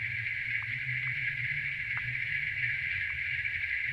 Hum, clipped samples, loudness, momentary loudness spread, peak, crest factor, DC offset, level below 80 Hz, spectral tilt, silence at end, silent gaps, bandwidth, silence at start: none; under 0.1%; -31 LUFS; 2 LU; -18 dBFS; 16 dB; under 0.1%; -58 dBFS; -4 dB/octave; 0 s; none; 13.5 kHz; 0 s